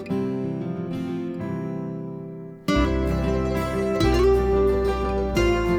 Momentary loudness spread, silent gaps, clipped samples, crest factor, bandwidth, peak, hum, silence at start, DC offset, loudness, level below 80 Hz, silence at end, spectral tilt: 12 LU; none; under 0.1%; 14 dB; 17 kHz; -8 dBFS; none; 0 s; under 0.1%; -24 LUFS; -30 dBFS; 0 s; -7 dB/octave